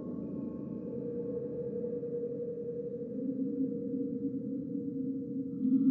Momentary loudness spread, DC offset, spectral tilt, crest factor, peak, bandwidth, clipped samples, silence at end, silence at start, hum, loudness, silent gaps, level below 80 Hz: 5 LU; under 0.1%; -14 dB/octave; 18 dB; -18 dBFS; 1.8 kHz; under 0.1%; 0 s; 0 s; none; -37 LUFS; none; -70 dBFS